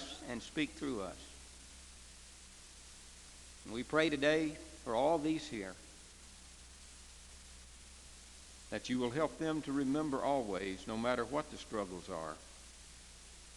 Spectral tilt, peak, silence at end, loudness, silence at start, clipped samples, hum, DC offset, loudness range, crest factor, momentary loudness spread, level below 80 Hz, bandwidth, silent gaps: -4.5 dB/octave; -16 dBFS; 0 s; -37 LUFS; 0 s; under 0.1%; none; under 0.1%; 10 LU; 24 dB; 21 LU; -60 dBFS; 12 kHz; none